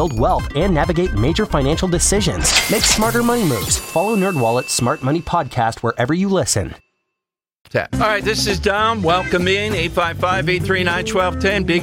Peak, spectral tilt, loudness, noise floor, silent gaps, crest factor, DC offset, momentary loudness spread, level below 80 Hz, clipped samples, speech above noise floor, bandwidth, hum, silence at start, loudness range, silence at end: -2 dBFS; -4 dB/octave; -17 LUFS; -84 dBFS; 7.61-7.65 s; 16 dB; under 0.1%; 5 LU; -30 dBFS; under 0.1%; 67 dB; 17 kHz; none; 0 s; 4 LU; 0 s